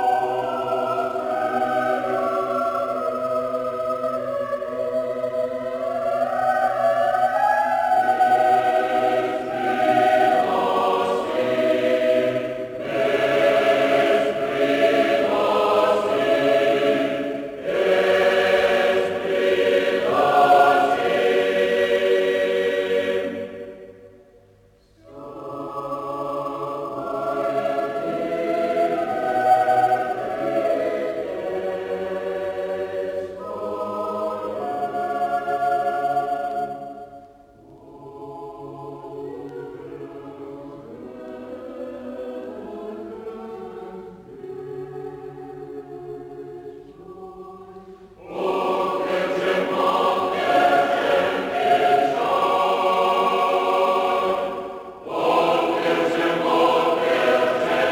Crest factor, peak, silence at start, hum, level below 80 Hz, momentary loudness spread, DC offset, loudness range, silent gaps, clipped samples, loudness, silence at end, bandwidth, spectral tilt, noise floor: 18 dB; -4 dBFS; 0 s; none; -60 dBFS; 18 LU; under 0.1%; 16 LU; none; under 0.1%; -21 LUFS; 0 s; 18.5 kHz; -5 dB/octave; -55 dBFS